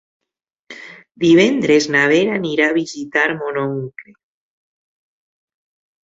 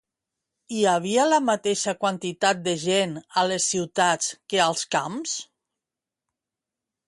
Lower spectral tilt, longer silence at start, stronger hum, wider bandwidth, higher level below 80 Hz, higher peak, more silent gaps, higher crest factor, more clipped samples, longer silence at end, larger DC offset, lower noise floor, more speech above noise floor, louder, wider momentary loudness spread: first, -5 dB/octave vs -3 dB/octave; about the same, 0.7 s vs 0.7 s; neither; second, 7.8 kHz vs 11.5 kHz; first, -60 dBFS vs -72 dBFS; first, 0 dBFS vs -8 dBFS; neither; about the same, 18 dB vs 18 dB; neither; first, 2 s vs 1.65 s; neither; second, -81 dBFS vs -88 dBFS; about the same, 65 dB vs 65 dB; first, -16 LUFS vs -23 LUFS; first, 19 LU vs 6 LU